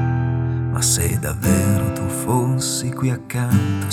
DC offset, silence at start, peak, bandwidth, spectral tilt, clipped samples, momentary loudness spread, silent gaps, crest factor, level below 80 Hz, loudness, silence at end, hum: under 0.1%; 0 s; -4 dBFS; 17 kHz; -5 dB/octave; under 0.1%; 5 LU; none; 16 dB; -42 dBFS; -20 LUFS; 0 s; none